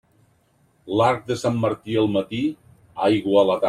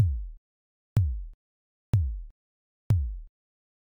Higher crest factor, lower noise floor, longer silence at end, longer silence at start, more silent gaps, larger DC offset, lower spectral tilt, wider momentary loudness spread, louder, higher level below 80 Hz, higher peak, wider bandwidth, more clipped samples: about the same, 16 dB vs 18 dB; second, -62 dBFS vs under -90 dBFS; second, 0 s vs 0.6 s; first, 0.85 s vs 0 s; second, none vs 0.38-0.96 s, 1.34-1.93 s, 2.31-2.90 s; neither; second, -6.5 dB/octave vs -9 dB/octave; second, 9 LU vs 17 LU; first, -22 LUFS vs -30 LUFS; second, -60 dBFS vs -36 dBFS; first, -6 dBFS vs -12 dBFS; first, 12.5 kHz vs 7.2 kHz; neither